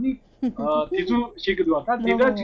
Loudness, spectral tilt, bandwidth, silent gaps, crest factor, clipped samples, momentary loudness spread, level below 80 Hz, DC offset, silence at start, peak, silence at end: -23 LUFS; -7 dB/octave; 6.8 kHz; none; 14 dB; under 0.1%; 8 LU; -48 dBFS; under 0.1%; 0 s; -8 dBFS; 0 s